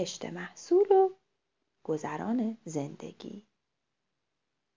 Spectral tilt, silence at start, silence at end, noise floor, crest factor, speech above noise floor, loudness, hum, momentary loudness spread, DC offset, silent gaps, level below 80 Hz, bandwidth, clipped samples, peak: -5.5 dB/octave; 0 s; 1.35 s; -85 dBFS; 20 dB; 55 dB; -30 LUFS; none; 21 LU; under 0.1%; none; -78 dBFS; 7.6 kHz; under 0.1%; -12 dBFS